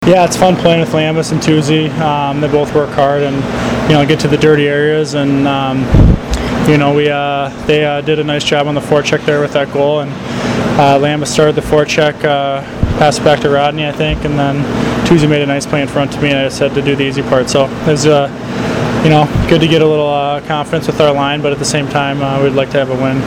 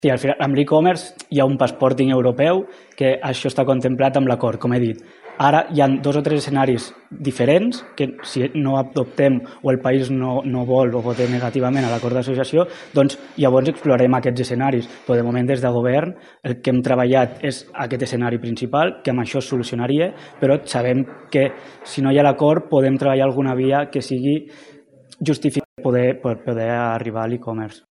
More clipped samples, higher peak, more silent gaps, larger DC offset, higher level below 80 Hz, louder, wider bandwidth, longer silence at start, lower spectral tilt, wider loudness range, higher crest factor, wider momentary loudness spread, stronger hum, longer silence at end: neither; about the same, 0 dBFS vs -2 dBFS; second, none vs 25.65-25.76 s; neither; first, -26 dBFS vs -58 dBFS; first, -12 LUFS vs -19 LUFS; first, 15.5 kHz vs 11.5 kHz; about the same, 0 s vs 0.05 s; second, -5.5 dB/octave vs -7 dB/octave; about the same, 2 LU vs 3 LU; about the same, 12 dB vs 16 dB; about the same, 6 LU vs 8 LU; neither; second, 0 s vs 0.15 s